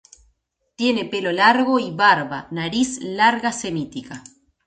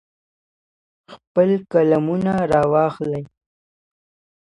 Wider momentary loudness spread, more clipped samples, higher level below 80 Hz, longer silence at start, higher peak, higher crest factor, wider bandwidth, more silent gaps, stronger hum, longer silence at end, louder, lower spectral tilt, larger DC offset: first, 14 LU vs 9 LU; neither; about the same, -58 dBFS vs -54 dBFS; second, 0.8 s vs 1.1 s; about the same, -2 dBFS vs -4 dBFS; about the same, 18 dB vs 16 dB; second, 9.4 kHz vs 11 kHz; second, none vs 1.27-1.35 s; neither; second, 0.45 s vs 1.15 s; about the same, -19 LUFS vs -19 LUFS; second, -4 dB/octave vs -9 dB/octave; neither